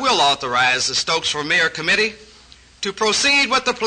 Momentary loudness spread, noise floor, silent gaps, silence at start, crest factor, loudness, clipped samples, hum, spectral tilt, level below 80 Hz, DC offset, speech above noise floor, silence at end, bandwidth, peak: 7 LU; -47 dBFS; none; 0 s; 12 dB; -17 LUFS; under 0.1%; none; -1 dB/octave; -52 dBFS; under 0.1%; 29 dB; 0 s; 9.6 kHz; -6 dBFS